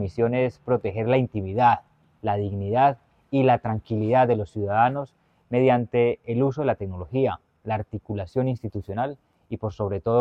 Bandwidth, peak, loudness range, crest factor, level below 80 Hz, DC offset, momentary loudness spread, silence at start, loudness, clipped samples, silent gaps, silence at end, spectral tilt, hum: 6.4 kHz; -6 dBFS; 5 LU; 18 dB; -54 dBFS; under 0.1%; 11 LU; 0 s; -24 LUFS; under 0.1%; none; 0 s; -9.5 dB/octave; none